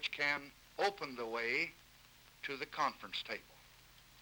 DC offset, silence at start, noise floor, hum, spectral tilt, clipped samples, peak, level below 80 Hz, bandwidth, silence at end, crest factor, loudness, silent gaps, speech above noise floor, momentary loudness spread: under 0.1%; 0 s; -63 dBFS; 60 Hz at -75 dBFS; -2.5 dB/octave; under 0.1%; -20 dBFS; -72 dBFS; over 20 kHz; 0 s; 22 dB; -39 LUFS; none; 23 dB; 15 LU